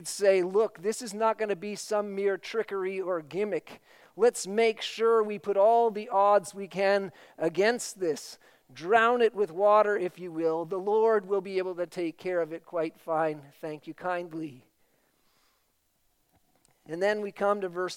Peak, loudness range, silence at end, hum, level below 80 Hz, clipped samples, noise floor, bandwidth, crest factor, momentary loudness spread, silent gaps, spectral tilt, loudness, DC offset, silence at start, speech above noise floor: -8 dBFS; 10 LU; 0 s; none; -82 dBFS; under 0.1%; -72 dBFS; 16 kHz; 20 dB; 11 LU; none; -4 dB/octave; -28 LUFS; under 0.1%; 0 s; 44 dB